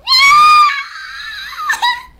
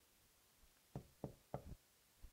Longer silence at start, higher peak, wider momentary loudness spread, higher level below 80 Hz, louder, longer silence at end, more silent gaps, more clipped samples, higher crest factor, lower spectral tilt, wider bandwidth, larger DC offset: about the same, 0.05 s vs 0 s; first, -2 dBFS vs -32 dBFS; first, 20 LU vs 10 LU; first, -48 dBFS vs -66 dBFS; first, -8 LUFS vs -56 LUFS; first, 0.2 s vs 0 s; neither; neither; second, 10 dB vs 26 dB; second, 2 dB/octave vs -6.5 dB/octave; about the same, 16 kHz vs 16 kHz; neither